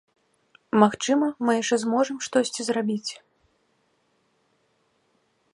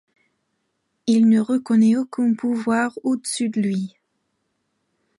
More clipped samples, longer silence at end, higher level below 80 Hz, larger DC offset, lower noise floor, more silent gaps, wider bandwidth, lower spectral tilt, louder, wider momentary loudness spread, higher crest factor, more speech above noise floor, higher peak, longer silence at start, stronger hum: neither; first, 2.4 s vs 1.3 s; about the same, -72 dBFS vs -72 dBFS; neither; second, -69 dBFS vs -73 dBFS; neither; about the same, 11.5 kHz vs 11.5 kHz; second, -4 dB/octave vs -5.5 dB/octave; second, -24 LUFS vs -20 LUFS; about the same, 9 LU vs 8 LU; first, 24 dB vs 14 dB; second, 46 dB vs 54 dB; first, -2 dBFS vs -8 dBFS; second, 0.75 s vs 1.05 s; neither